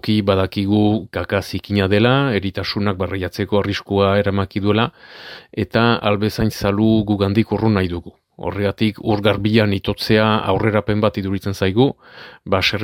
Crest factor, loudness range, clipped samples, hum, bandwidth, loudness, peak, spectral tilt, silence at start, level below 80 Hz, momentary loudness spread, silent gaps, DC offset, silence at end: 18 dB; 1 LU; under 0.1%; none; 16 kHz; -18 LUFS; 0 dBFS; -7 dB/octave; 0.05 s; -44 dBFS; 8 LU; none; under 0.1%; 0 s